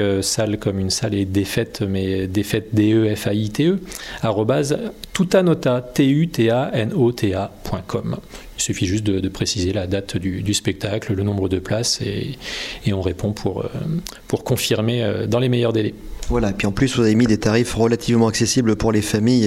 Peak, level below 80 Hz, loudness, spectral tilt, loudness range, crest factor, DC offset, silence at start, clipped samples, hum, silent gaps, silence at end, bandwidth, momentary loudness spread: -4 dBFS; -40 dBFS; -20 LUFS; -5.5 dB/octave; 4 LU; 16 dB; under 0.1%; 0 s; under 0.1%; none; none; 0 s; 16 kHz; 9 LU